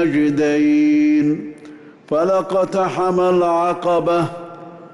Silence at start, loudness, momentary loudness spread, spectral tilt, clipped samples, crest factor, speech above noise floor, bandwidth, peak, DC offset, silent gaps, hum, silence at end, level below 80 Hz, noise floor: 0 s; -17 LUFS; 11 LU; -7 dB/octave; under 0.1%; 8 dB; 24 dB; 11 kHz; -8 dBFS; under 0.1%; none; none; 0.05 s; -56 dBFS; -40 dBFS